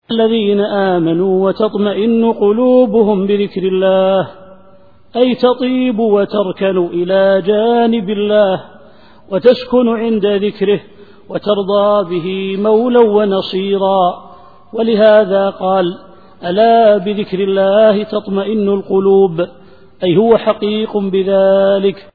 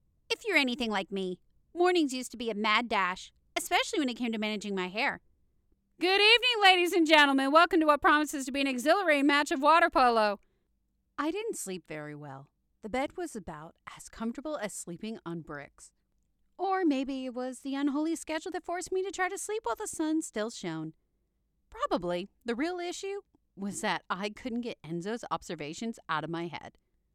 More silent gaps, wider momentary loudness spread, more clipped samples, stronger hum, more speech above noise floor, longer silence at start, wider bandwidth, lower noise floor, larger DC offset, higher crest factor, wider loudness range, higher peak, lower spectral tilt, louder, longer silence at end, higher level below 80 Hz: neither; second, 8 LU vs 18 LU; neither; neither; second, 34 dB vs 46 dB; second, 0.1 s vs 0.3 s; second, 4.9 kHz vs 17 kHz; second, -46 dBFS vs -76 dBFS; first, 0.6% vs under 0.1%; second, 12 dB vs 22 dB; second, 2 LU vs 15 LU; first, 0 dBFS vs -10 dBFS; first, -9.5 dB/octave vs -3 dB/octave; first, -13 LUFS vs -29 LUFS; second, 0.15 s vs 0.45 s; first, -54 dBFS vs -64 dBFS